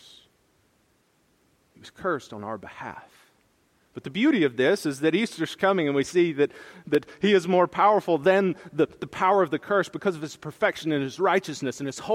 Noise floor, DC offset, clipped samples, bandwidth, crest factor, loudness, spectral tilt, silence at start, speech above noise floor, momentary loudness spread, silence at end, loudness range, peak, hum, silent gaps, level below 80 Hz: -66 dBFS; under 0.1%; under 0.1%; 15 kHz; 18 dB; -24 LUFS; -5.5 dB/octave; 1.85 s; 42 dB; 15 LU; 0 s; 14 LU; -8 dBFS; none; none; -68 dBFS